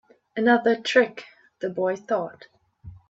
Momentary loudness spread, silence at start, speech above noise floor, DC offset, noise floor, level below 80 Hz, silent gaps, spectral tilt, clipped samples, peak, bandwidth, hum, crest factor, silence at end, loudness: 16 LU; 0.35 s; 23 dB; under 0.1%; -46 dBFS; -64 dBFS; none; -5 dB/octave; under 0.1%; -4 dBFS; 8 kHz; none; 20 dB; 0.15 s; -23 LUFS